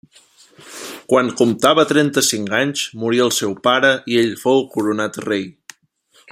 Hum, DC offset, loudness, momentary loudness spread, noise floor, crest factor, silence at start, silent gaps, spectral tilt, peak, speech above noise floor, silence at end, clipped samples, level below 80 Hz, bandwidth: none; under 0.1%; -17 LUFS; 9 LU; -56 dBFS; 18 dB; 0.65 s; none; -3.5 dB/octave; 0 dBFS; 39 dB; 0.8 s; under 0.1%; -62 dBFS; 16 kHz